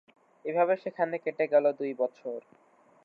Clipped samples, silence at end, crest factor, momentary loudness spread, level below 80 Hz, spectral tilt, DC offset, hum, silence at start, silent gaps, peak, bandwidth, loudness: under 0.1%; 0.65 s; 18 dB; 15 LU; under -90 dBFS; -8 dB/octave; under 0.1%; none; 0.45 s; none; -12 dBFS; 5 kHz; -29 LUFS